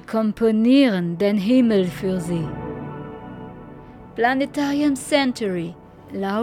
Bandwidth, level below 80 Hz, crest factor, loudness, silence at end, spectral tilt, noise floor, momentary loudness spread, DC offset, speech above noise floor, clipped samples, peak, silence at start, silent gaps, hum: 15 kHz; -50 dBFS; 16 dB; -20 LUFS; 0 s; -6 dB/octave; -40 dBFS; 20 LU; under 0.1%; 21 dB; under 0.1%; -6 dBFS; 0.1 s; none; none